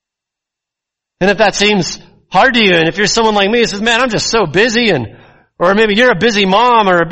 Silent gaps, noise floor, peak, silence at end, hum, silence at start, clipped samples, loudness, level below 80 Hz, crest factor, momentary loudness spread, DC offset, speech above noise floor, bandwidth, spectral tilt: none; -82 dBFS; 0 dBFS; 0 s; none; 1.2 s; under 0.1%; -11 LUFS; -40 dBFS; 12 dB; 7 LU; under 0.1%; 71 dB; 8.6 kHz; -3.5 dB/octave